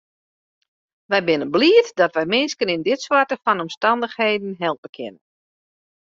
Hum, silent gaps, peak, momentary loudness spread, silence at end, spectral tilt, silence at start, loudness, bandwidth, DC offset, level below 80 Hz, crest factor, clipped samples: none; 3.77-3.81 s, 4.78-4.83 s, 4.89-4.93 s; -2 dBFS; 11 LU; 0.9 s; -4 dB/octave; 1.1 s; -19 LUFS; 7.6 kHz; under 0.1%; -66 dBFS; 18 dB; under 0.1%